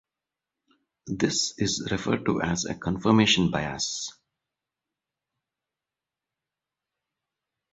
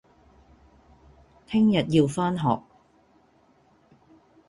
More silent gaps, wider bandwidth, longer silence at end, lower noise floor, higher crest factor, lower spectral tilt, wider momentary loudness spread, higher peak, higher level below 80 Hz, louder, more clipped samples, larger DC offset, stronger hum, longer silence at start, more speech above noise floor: neither; second, 8.2 kHz vs 11.5 kHz; first, 3.6 s vs 1.9 s; first, -89 dBFS vs -61 dBFS; about the same, 24 dB vs 20 dB; second, -4 dB/octave vs -7 dB/octave; about the same, 9 LU vs 7 LU; about the same, -6 dBFS vs -8 dBFS; about the same, -54 dBFS vs -58 dBFS; about the same, -25 LUFS vs -24 LUFS; neither; neither; neither; second, 1.05 s vs 1.5 s; first, 64 dB vs 39 dB